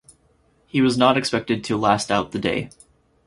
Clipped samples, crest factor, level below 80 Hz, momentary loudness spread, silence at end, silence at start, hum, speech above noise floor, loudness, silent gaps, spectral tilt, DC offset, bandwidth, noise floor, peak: under 0.1%; 22 dB; -52 dBFS; 9 LU; 0.6 s; 0.75 s; none; 40 dB; -21 LUFS; none; -5 dB/octave; under 0.1%; 11.5 kHz; -61 dBFS; 0 dBFS